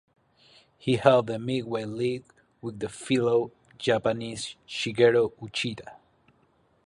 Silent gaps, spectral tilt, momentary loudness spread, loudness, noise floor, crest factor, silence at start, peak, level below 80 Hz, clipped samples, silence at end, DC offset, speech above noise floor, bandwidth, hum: none; -5.5 dB/octave; 15 LU; -27 LUFS; -66 dBFS; 24 dB; 0.85 s; -2 dBFS; -64 dBFS; under 0.1%; 0.9 s; under 0.1%; 40 dB; 11 kHz; none